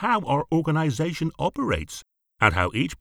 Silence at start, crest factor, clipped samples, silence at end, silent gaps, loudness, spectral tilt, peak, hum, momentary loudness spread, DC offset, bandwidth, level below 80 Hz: 0 s; 22 dB; under 0.1%; 0.05 s; none; -24 LUFS; -6 dB/octave; -2 dBFS; none; 7 LU; under 0.1%; 14.5 kHz; -44 dBFS